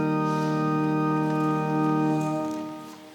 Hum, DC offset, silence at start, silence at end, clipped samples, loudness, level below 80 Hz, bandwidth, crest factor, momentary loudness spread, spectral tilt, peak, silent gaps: none; under 0.1%; 0 s; 0 s; under 0.1%; -25 LUFS; -66 dBFS; 17 kHz; 12 dB; 9 LU; -7.5 dB/octave; -14 dBFS; none